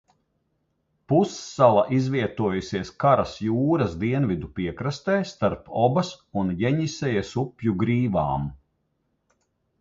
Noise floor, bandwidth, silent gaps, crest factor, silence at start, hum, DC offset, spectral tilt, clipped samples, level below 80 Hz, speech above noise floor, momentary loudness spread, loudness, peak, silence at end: -73 dBFS; 7.8 kHz; none; 22 dB; 1.1 s; none; under 0.1%; -7 dB/octave; under 0.1%; -50 dBFS; 50 dB; 8 LU; -24 LUFS; -4 dBFS; 1.25 s